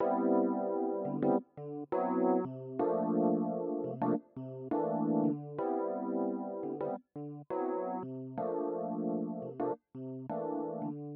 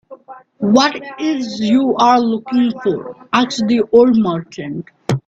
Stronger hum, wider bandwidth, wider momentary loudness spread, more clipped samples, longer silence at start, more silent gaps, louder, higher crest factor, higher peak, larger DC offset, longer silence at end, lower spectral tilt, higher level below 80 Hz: neither; second, 3.7 kHz vs 7.8 kHz; second, 10 LU vs 13 LU; neither; about the same, 0 s vs 0.1 s; neither; second, -35 LUFS vs -15 LUFS; about the same, 16 dB vs 14 dB; second, -18 dBFS vs 0 dBFS; neither; about the same, 0 s vs 0.1 s; first, -10.5 dB/octave vs -5.5 dB/octave; second, -80 dBFS vs -56 dBFS